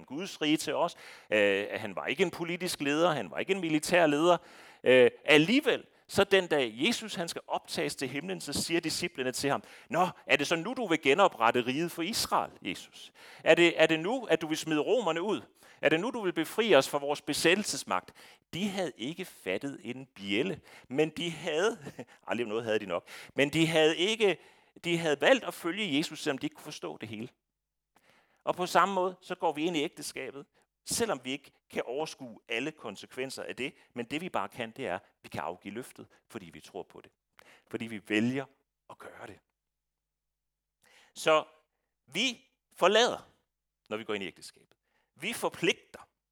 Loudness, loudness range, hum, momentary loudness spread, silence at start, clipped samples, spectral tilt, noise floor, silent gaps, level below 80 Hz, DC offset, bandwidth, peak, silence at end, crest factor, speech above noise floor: -30 LUFS; 11 LU; none; 18 LU; 0 s; under 0.1%; -3.5 dB/octave; -87 dBFS; none; -72 dBFS; under 0.1%; 18.5 kHz; -6 dBFS; 0.3 s; 26 dB; 57 dB